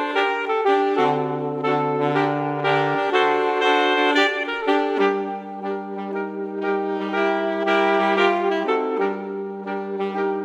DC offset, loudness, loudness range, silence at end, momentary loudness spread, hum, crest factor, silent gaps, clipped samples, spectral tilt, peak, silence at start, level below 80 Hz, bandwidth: under 0.1%; -21 LUFS; 3 LU; 0 s; 11 LU; none; 18 dB; none; under 0.1%; -5.5 dB/octave; -2 dBFS; 0 s; -72 dBFS; 8.4 kHz